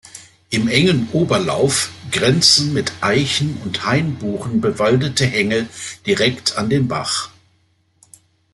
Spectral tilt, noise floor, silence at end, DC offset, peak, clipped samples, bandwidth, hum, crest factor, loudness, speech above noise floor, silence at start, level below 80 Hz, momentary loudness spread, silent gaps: -4 dB/octave; -60 dBFS; 1.25 s; under 0.1%; 0 dBFS; under 0.1%; 12.5 kHz; none; 18 dB; -17 LUFS; 43 dB; 0.05 s; -52 dBFS; 9 LU; none